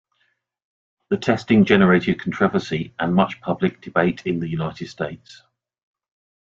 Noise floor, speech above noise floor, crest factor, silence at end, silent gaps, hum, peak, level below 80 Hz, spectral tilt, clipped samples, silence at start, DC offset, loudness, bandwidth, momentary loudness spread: -69 dBFS; 49 dB; 20 dB; 1.1 s; none; none; -2 dBFS; -54 dBFS; -7.5 dB/octave; under 0.1%; 1.1 s; under 0.1%; -20 LUFS; 7.6 kHz; 14 LU